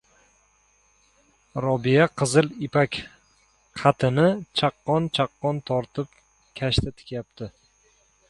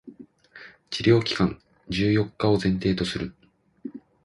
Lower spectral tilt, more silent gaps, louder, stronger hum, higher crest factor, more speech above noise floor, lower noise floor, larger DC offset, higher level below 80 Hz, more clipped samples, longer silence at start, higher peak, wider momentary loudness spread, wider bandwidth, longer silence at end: about the same, -5.5 dB/octave vs -6.5 dB/octave; neither; about the same, -23 LUFS vs -24 LUFS; first, 50 Hz at -50 dBFS vs none; about the same, 22 dB vs 20 dB; first, 40 dB vs 26 dB; first, -63 dBFS vs -49 dBFS; neither; about the same, -48 dBFS vs -48 dBFS; neither; first, 1.55 s vs 0.05 s; about the same, -4 dBFS vs -6 dBFS; second, 18 LU vs 21 LU; about the same, 11.5 kHz vs 11.5 kHz; first, 0.8 s vs 0.25 s